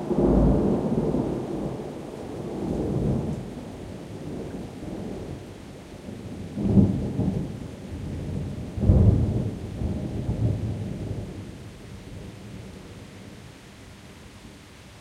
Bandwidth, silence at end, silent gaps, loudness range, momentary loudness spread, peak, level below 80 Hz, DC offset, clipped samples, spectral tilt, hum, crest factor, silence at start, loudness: 12.5 kHz; 0 s; none; 13 LU; 23 LU; -4 dBFS; -36 dBFS; under 0.1%; under 0.1%; -9 dB/octave; none; 22 dB; 0 s; -27 LUFS